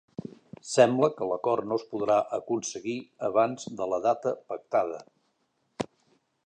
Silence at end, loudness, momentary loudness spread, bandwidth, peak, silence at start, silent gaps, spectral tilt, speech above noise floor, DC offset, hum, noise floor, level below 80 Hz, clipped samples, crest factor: 0.6 s; -28 LUFS; 15 LU; 9.6 kHz; -6 dBFS; 0.25 s; none; -5 dB/octave; 47 dB; under 0.1%; none; -74 dBFS; -72 dBFS; under 0.1%; 22 dB